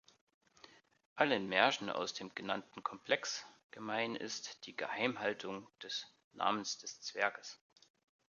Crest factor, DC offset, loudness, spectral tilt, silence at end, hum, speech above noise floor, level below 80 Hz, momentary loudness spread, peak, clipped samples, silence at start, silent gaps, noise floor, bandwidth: 28 dB; under 0.1%; -38 LUFS; -2.5 dB/octave; 0.75 s; none; 25 dB; -84 dBFS; 16 LU; -12 dBFS; under 0.1%; 1.15 s; 3.64-3.69 s, 6.24-6.31 s; -64 dBFS; 7.4 kHz